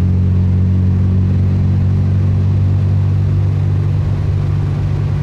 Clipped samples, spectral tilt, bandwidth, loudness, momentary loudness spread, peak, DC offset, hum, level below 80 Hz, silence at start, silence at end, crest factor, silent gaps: under 0.1%; -10 dB/octave; 4.6 kHz; -14 LUFS; 3 LU; -6 dBFS; under 0.1%; none; -28 dBFS; 0 s; 0 s; 6 dB; none